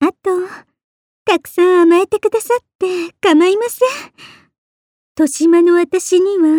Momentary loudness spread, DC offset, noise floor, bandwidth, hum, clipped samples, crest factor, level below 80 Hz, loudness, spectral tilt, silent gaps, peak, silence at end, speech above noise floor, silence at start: 10 LU; under 0.1%; under -90 dBFS; 17 kHz; none; under 0.1%; 12 dB; -62 dBFS; -14 LUFS; -3 dB/octave; 0.84-1.26 s, 2.75-2.79 s, 4.58-5.15 s; -2 dBFS; 0 s; over 77 dB; 0 s